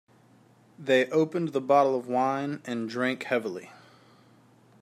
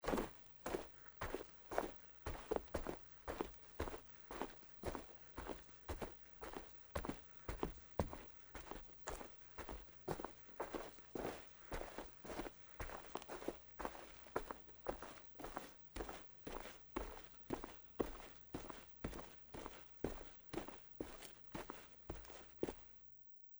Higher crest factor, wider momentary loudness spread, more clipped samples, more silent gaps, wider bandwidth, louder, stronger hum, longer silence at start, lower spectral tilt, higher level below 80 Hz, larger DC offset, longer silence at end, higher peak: second, 20 dB vs 28 dB; first, 11 LU vs 8 LU; neither; neither; second, 14 kHz vs over 20 kHz; first, -27 LUFS vs -50 LUFS; neither; first, 0.8 s vs 0 s; about the same, -6 dB/octave vs -5 dB/octave; second, -80 dBFS vs -58 dBFS; neither; first, 1.05 s vs 0 s; first, -10 dBFS vs -22 dBFS